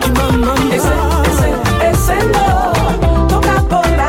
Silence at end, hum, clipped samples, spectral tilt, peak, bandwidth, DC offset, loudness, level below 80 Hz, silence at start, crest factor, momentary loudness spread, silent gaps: 0 s; none; under 0.1%; -5.5 dB/octave; -2 dBFS; 17 kHz; under 0.1%; -13 LUFS; -18 dBFS; 0 s; 10 dB; 1 LU; none